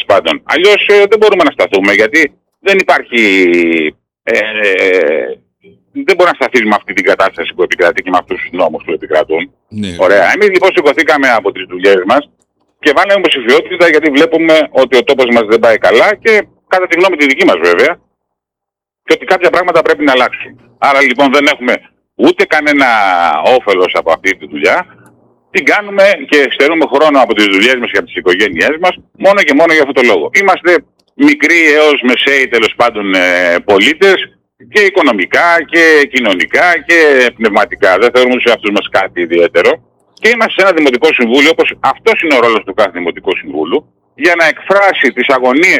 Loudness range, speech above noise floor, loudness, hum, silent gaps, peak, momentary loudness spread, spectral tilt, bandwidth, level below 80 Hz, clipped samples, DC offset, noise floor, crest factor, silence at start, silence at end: 3 LU; 72 dB; -9 LUFS; none; none; 0 dBFS; 7 LU; -3.5 dB/octave; 18 kHz; -52 dBFS; 0.1%; under 0.1%; -81 dBFS; 10 dB; 0 s; 0 s